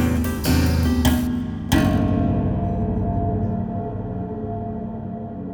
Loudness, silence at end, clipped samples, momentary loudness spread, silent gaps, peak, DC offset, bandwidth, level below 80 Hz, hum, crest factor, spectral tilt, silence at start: -22 LUFS; 0 s; under 0.1%; 10 LU; none; -4 dBFS; under 0.1%; over 20 kHz; -30 dBFS; none; 18 dB; -6.5 dB/octave; 0 s